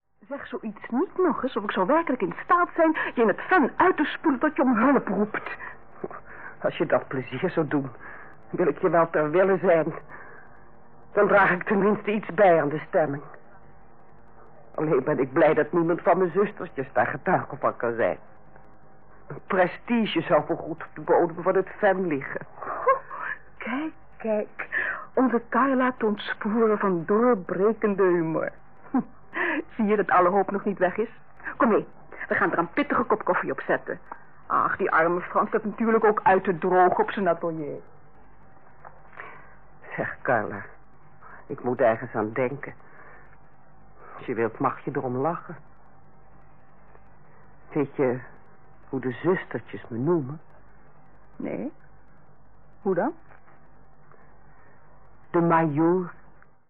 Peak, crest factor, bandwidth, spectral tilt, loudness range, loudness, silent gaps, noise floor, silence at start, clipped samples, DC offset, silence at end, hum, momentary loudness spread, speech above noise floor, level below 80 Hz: -10 dBFS; 16 dB; 4.5 kHz; -10.5 dB/octave; 10 LU; -25 LUFS; none; -56 dBFS; 0 s; under 0.1%; 0.6%; 0 s; none; 17 LU; 32 dB; -62 dBFS